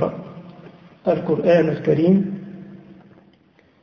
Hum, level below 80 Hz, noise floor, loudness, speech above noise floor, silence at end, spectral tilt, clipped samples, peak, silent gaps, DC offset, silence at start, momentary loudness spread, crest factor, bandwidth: none; -58 dBFS; -56 dBFS; -19 LUFS; 39 dB; 0.9 s; -9.5 dB/octave; under 0.1%; -4 dBFS; none; under 0.1%; 0 s; 23 LU; 18 dB; 6.4 kHz